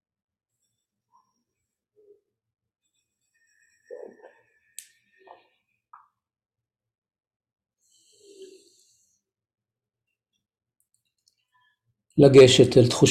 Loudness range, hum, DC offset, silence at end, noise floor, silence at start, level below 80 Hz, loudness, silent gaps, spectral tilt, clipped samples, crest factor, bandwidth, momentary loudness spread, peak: 29 LU; none; under 0.1%; 0 s; -88 dBFS; 12.15 s; -58 dBFS; -16 LUFS; none; -5.5 dB/octave; under 0.1%; 24 dB; 13.5 kHz; 31 LU; -2 dBFS